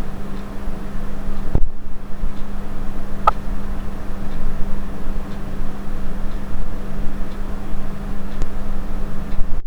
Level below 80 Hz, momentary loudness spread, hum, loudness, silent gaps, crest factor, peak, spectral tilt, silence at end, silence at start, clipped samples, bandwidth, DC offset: -22 dBFS; 6 LU; none; -29 LUFS; none; 14 dB; 0 dBFS; -7 dB/octave; 0 s; 0 s; under 0.1%; 3.9 kHz; under 0.1%